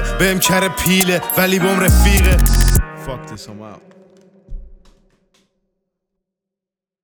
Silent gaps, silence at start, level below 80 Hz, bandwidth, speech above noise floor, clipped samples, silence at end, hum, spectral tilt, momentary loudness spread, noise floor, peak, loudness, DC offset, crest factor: none; 0 s; -20 dBFS; over 20 kHz; 73 dB; under 0.1%; 2.3 s; none; -4 dB/octave; 19 LU; -87 dBFS; 0 dBFS; -14 LUFS; under 0.1%; 16 dB